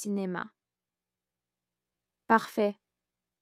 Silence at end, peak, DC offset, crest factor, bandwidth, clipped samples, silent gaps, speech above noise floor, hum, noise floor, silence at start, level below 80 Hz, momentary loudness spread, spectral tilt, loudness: 0.7 s; -8 dBFS; under 0.1%; 26 dB; 15.5 kHz; under 0.1%; none; over 61 dB; none; under -90 dBFS; 0 s; -82 dBFS; 17 LU; -5.5 dB/octave; -29 LUFS